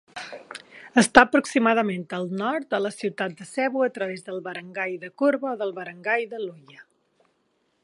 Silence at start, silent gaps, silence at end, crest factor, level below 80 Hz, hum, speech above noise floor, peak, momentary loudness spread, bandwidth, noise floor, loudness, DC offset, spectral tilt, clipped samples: 0.15 s; none; 1 s; 26 dB; -60 dBFS; none; 46 dB; 0 dBFS; 18 LU; 11.5 kHz; -70 dBFS; -24 LUFS; under 0.1%; -4.5 dB/octave; under 0.1%